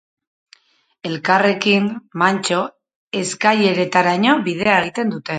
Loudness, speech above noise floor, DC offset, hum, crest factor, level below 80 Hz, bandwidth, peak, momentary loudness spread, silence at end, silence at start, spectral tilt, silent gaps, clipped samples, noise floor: -17 LUFS; 44 dB; under 0.1%; none; 18 dB; -62 dBFS; 9.4 kHz; 0 dBFS; 9 LU; 0 s; 1.05 s; -4.5 dB/octave; 2.96-3.11 s; under 0.1%; -61 dBFS